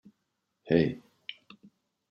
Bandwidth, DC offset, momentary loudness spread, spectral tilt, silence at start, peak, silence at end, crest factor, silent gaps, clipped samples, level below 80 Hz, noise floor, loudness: 6.4 kHz; under 0.1%; 19 LU; -9 dB/octave; 0.65 s; -10 dBFS; 0.8 s; 24 dB; none; under 0.1%; -64 dBFS; -81 dBFS; -28 LUFS